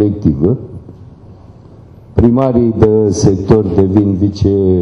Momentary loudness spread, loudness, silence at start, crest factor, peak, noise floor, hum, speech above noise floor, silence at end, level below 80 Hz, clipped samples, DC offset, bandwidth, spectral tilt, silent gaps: 8 LU; -12 LUFS; 0 s; 12 dB; 0 dBFS; -37 dBFS; none; 27 dB; 0 s; -30 dBFS; 0.2%; under 0.1%; 10.5 kHz; -8.5 dB/octave; none